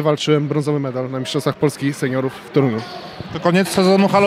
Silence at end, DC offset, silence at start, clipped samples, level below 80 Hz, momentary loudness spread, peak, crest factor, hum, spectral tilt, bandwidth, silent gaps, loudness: 0 s; under 0.1%; 0 s; under 0.1%; -56 dBFS; 10 LU; -2 dBFS; 16 dB; none; -6 dB/octave; 15.5 kHz; none; -18 LUFS